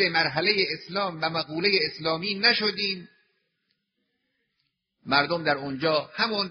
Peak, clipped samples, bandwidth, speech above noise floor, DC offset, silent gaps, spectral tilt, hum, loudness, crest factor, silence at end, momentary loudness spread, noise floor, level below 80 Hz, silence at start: -4 dBFS; under 0.1%; 6.4 kHz; 52 dB; under 0.1%; none; -1 dB/octave; none; -24 LUFS; 22 dB; 0 s; 7 LU; -78 dBFS; -68 dBFS; 0 s